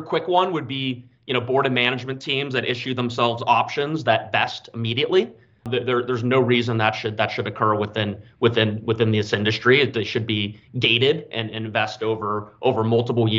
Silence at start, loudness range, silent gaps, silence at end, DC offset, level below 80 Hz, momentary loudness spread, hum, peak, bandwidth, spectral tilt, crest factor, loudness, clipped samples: 0 s; 2 LU; none; 0 s; under 0.1%; -62 dBFS; 8 LU; none; -2 dBFS; 7.6 kHz; -6 dB/octave; 20 dB; -22 LUFS; under 0.1%